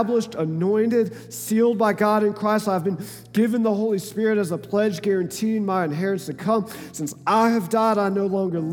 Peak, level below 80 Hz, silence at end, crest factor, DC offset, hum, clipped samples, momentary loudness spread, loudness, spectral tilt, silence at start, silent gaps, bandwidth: -6 dBFS; -68 dBFS; 0 s; 16 dB; under 0.1%; none; under 0.1%; 7 LU; -22 LUFS; -6 dB/octave; 0 s; none; 18.5 kHz